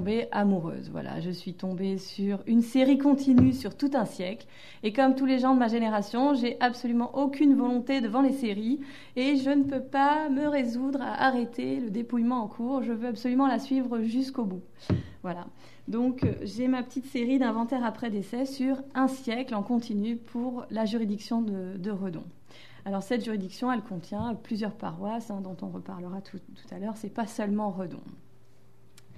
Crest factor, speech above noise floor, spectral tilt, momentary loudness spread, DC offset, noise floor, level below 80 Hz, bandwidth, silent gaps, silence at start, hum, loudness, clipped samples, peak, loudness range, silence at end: 20 dB; 32 dB; -7 dB/octave; 14 LU; 0.3%; -60 dBFS; -60 dBFS; 13 kHz; none; 0 s; none; -28 LUFS; under 0.1%; -8 dBFS; 9 LU; 1.05 s